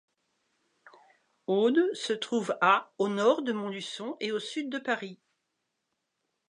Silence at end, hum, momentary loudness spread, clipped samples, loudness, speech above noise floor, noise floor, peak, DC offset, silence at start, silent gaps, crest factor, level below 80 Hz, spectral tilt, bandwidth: 1.35 s; none; 11 LU; under 0.1%; -29 LUFS; 53 dB; -82 dBFS; -10 dBFS; under 0.1%; 1.5 s; none; 22 dB; -88 dBFS; -4.5 dB/octave; 11 kHz